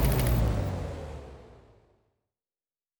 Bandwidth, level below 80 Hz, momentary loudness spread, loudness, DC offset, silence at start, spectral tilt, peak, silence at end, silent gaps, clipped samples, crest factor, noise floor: over 20 kHz; -34 dBFS; 22 LU; -29 LUFS; under 0.1%; 0 s; -6 dB/octave; -14 dBFS; 1.45 s; none; under 0.1%; 18 dB; under -90 dBFS